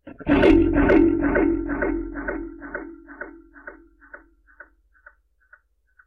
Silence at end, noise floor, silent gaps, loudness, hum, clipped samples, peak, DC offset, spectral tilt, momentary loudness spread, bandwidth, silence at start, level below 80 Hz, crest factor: 1.9 s; -60 dBFS; none; -20 LUFS; none; under 0.1%; -6 dBFS; under 0.1%; -8.5 dB/octave; 25 LU; 5.6 kHz; 0.05 s; -36 dBFS; 16 dB